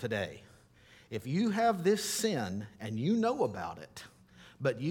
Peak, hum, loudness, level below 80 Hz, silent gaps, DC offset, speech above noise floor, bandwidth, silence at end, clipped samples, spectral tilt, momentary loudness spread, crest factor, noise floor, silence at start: -16 dBFS; none; -33 LUFS; -68 dBFS; none; under 0.1%; 28 dB; 18 kHz; 0 s; under 0.1%; -5 dB/octave; 15 LU; 18 dB; -60 dBFS; 0 s